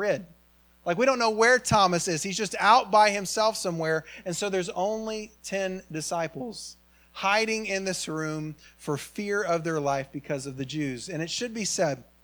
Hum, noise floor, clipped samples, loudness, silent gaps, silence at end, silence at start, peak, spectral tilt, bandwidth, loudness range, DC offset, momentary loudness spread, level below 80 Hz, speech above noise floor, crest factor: none; -60 dBFS; under 0.1%; -26 LUFS; none; 0.2 s; 0 s; -6 dBFS; -3.5 dB/octave; over 20 kHz; 8 LU; under 0.1%; 13 LU; -60 dBFS; 33 dB; 22 dB